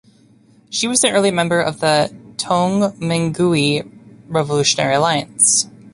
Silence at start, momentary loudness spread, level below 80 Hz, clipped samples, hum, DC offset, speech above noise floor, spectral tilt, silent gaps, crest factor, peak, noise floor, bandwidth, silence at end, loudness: 0.7 s; 9 LU; -54 dBFS; under 0.1%; none; under 0.1%; 34 dB; -3.5 dB/octave; none; 18 dB; 0 dBFS; -51 dBFS; 11.5 kHz; 0.05 s; -16 LUFS